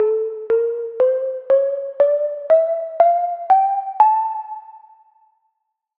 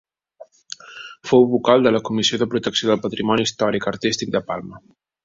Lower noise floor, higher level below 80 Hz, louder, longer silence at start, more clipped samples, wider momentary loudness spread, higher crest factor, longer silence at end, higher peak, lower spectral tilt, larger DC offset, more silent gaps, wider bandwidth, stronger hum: first, -75 dBFS vs -47 dBFS; second, -76 dBFS vs -56 dBFS; about the same, -18 LUFS vs -19 LUFS; second, 0 s vs 0.4 s; neither; second, 8 LU vs 20 LU; about the same, 16 dB vs 18 dB; first, 1.2 s vs 0.45 s; about the same, -2 dBFS vs -2 dBFS; first, -6.5 dB/octave vs -4.5 dB/octave; neither; neither; second, 4.2 kHz vs 7.8 kHz; neither